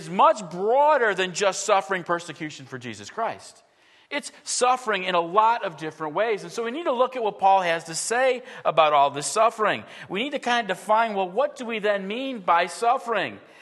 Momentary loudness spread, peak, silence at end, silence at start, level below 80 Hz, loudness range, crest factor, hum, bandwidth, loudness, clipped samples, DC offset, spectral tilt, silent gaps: 12 LU; -4 dBFS; 0.25 s; 0 s; -80 dBFS; 5 LU; 20 dB; none; 12.5 kHz; -23 LUFS; under 0.1%; under 0.1%; -3 dB/octave; none